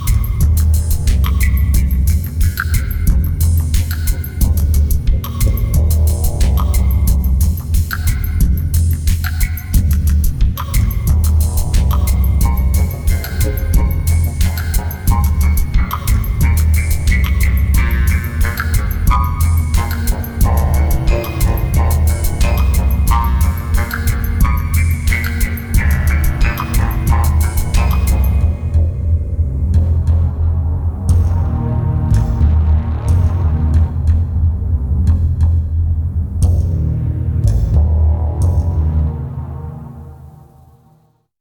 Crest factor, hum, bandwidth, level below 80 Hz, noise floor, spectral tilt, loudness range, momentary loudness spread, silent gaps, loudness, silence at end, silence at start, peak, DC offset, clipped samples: 12 dB; none; 20 kHz; -16 dBFS; -53 dBFS; -6 dB/octave; 1 LU; 4 LU; none; -16 LUFS; 1 s; 0 s; -2 dBFS; under 0.1%; under 0.1%